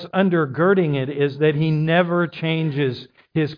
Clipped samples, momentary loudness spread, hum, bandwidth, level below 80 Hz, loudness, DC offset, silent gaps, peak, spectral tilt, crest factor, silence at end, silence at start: under 0.1%; 6 LU; none; 5.2 kHz; -60 dBFS; -20 LUFS; under 0.1%; none; -6 dBFS; -9.5 dB/octave; 14 dB; 0 s; 0 s